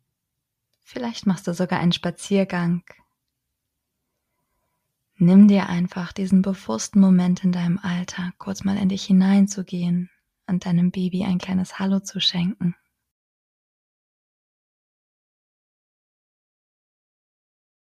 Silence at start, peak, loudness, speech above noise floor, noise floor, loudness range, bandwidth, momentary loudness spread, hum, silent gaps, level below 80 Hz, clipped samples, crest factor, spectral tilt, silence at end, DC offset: 0.95 s; -4 dBFS; -21 LUFS; 60 dB; -80 dBFS; 8 LU; 11 kHz; 12 LU; none; none; -60 dBFS; under 0.1%; 18 dB; -6 dB/octave; 5.25 s; under 0.1%